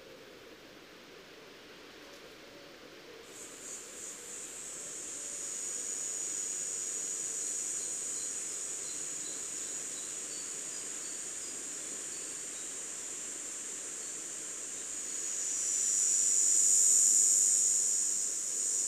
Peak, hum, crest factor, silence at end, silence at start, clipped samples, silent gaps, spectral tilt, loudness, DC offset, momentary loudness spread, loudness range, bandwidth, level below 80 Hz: -12 dBFS; none; 22 dB; 0 s; 0 s; under 0.1%; none; 1.5 dB/octave; -31 LUFS; under 0.1%; 27 LU; 20 LU; 15.5 kHz; -76 dBFS